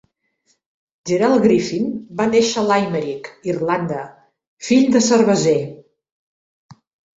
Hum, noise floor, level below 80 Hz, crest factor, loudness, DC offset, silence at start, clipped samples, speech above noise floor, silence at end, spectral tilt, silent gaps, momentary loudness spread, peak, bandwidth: none; -66 dBFS; -58 dBFS; 16 dB; -17 LUFS; under 0.1%; 1.05 s; under 0.1%; 49 dB; 0.45 s; -5 dB/octave; 4.47-4.57 s, 6.12-6.69 s; 14 LU; -2 dBFS; 8 kHz